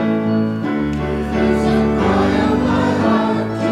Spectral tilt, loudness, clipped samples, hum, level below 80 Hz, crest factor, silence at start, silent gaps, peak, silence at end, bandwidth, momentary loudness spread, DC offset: -7.5 dB/octave; -17 LUFS; under 0.1%; none; -32 dBFS; 14 dB; 0 s; none; -2 dBFS; 0 s; 11 kHz; 5 LU; under 0.1%